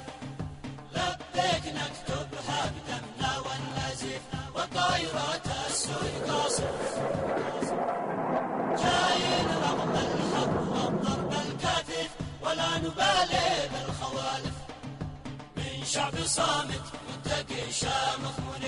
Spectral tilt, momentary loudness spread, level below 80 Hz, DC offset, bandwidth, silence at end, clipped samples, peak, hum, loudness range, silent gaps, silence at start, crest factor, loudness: -3.5 dB/octave; 11 LU; -50 dBFS; under 0.1%; 11 kHz; 0 s; under 0.1%; -14 dBFS; none; 4 LU; none; 0 s; 16 dB; -30 LUFS